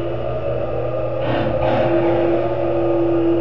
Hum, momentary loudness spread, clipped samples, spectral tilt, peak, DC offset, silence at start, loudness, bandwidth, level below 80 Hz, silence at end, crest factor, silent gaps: 60 Hz at -30 dBFS; 6 LU; under 0.1%; -10 dB/octave; -4 dBFS; 4%; 0 s; -19 LUFS; 5.6 kHz; -38 dBFS; 0 s; 14 dB; none